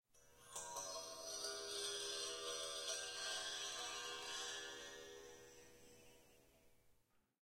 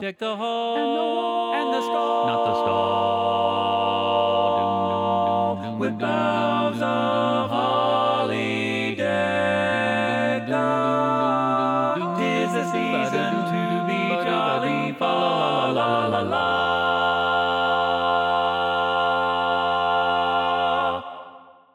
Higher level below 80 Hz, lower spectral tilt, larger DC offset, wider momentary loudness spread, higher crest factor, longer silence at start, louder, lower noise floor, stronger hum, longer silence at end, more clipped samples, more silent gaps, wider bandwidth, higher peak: second, -78 dBFS vs -62 dBFS; second, 0.5 dB/octave vs -5.5 dB/octave; neither; first, 19 LU vs 3 LU; about the same, 18 dB vs 16 dB; first, 0.15 s vs 0 s; second, -46 LUFS vs -22 LUFS; first, -77 dBFS vs -46 dBFS; neither; first, 0.5 s vs 0.35 s; neither; neither; first, 16 kHz vs 12.5 kHz; second, -32 dBFS vs -8 dBFS